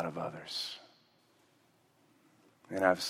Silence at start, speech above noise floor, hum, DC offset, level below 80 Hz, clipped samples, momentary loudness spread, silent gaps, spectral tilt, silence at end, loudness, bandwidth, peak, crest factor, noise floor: 0 s; 35 dB; none; under 0.1%; -82 dBFS; under 0.1%; 12 LU; none; -3.5 dB/octave; 0 s; -36 LUFS; 16 kHz; -12 dBFS; 26 dB; -69 dBFS